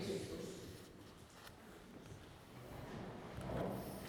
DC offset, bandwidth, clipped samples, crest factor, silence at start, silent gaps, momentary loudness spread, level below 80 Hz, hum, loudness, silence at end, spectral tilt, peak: under 0.1%; over 20 kHz; under 0.1%; 20 dB; 0 s; none; 13 LU; -62 dBFS; none; -50 LUFS; 0 s; -5.5 dB/octave; -28 dBFS